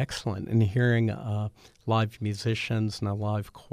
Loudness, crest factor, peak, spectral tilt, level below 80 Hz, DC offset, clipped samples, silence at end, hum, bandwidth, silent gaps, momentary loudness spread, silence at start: -28 LUFS; 14 dB; -12 dBFS; -6.5 dB/octave; -56 dBFS; under 0.1%; under 0.1%; 0.1 s; none; 11 kHz; none; 9 LU; 0 s